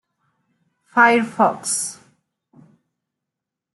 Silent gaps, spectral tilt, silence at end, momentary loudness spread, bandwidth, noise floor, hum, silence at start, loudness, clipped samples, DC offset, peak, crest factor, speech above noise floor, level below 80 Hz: none; -2.5 dB/octave; 1.8 s; 9 LU; 12.5 kHz; -84 dBFS; none; 0.95 s; -18 LUFS; under 0.1%; under 0.1%; -2 dBFS; 20 dB; 67 dB; -76 dBFS